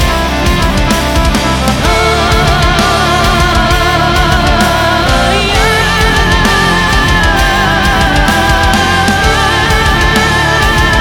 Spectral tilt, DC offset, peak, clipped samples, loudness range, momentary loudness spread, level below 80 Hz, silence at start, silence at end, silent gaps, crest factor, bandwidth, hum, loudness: -4 dB/octave; 0.3%; 0 dBFS; under 0.1%; 1 LU; 2 LU; -16 dBFS; 0 s; 0 s; none; 8 dB; 19.5 kHz; none; -9 LUFS